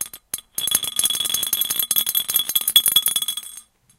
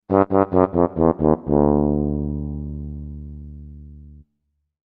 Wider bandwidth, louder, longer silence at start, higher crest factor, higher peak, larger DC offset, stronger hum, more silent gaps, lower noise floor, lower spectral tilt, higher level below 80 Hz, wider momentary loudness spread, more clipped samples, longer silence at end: first, 17 kHz vs 3.6 kHz; about the same, -18 LUFS vs -20 LUFS; about the same, 0 s vs 0.1 s; about the same, 22 dB vs 20 dB; about the same, 0 dBFS vs 0 dBFS; neither; neither; neither; second, -44 dBFS vs -73 dBFS; second, 2 dB/octave vs -13.5 dB/octave; second, -60 dBFS vs -34 dBFS; second, 14 LU vs 20 LU; neither; second, 0.4 s vs 0.65 s